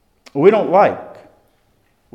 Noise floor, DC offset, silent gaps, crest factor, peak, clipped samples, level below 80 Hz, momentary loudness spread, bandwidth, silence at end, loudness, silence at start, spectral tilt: -60 dBFS; under 0.1%; none; 18 dB; 0 dBFS; under 0.1%; -66 dBFS; 16 LU; 6.6 kHz; 1.05 s; -14 LUFS; 0.35 s; -8 dB/octave